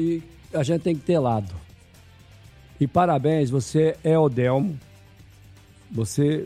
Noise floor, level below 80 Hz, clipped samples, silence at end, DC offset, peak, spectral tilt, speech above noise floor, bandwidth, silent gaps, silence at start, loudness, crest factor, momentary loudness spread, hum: -50 dBFS; -52 dBFS; under 0.1%; 0 s; under 0.1%; -6 dBFS; -7 dB/octave; 28 dB; 13.5 kHz; none; 0 s; -23 LUFS; 18 dB; 11 LU; none